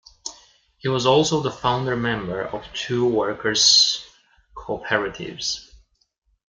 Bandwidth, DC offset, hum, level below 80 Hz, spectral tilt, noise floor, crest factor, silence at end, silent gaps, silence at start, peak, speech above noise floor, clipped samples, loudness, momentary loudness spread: 10 kHz; under 0.1%; none; -52 dBFS; -3 dB/octave; -54 dBFS; 20 dB; 0.85 s; none; 0.25 s; -4 dBFS; 33 dB; under 0.1%; -20 LUFS; 17 LU